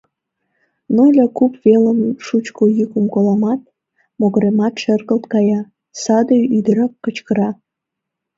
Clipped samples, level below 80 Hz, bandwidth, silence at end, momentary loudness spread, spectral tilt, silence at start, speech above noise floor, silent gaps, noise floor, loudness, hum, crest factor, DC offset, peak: under 0.1%; -62 dBFS; 7.8 kHz; 0.85 s; 9 LU; -7 dB/octave; 0.9 s; 66 dB; none; -80 dBFS; -15 LUFS; none; 14 dB; under 0.1%; 0 dBFS